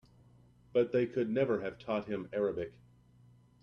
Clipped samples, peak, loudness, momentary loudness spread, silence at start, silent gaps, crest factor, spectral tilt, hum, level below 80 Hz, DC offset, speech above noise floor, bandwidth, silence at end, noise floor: under 0.1%; -18 dBFS; -34 LUFS; 7 LU; 0.75 s; none; 18 dB; -8.5 dB/octave; none; -68 dBFS; under 0.1%; 29 dB; 6.6 kHz; 0.9 s; -62 dBFS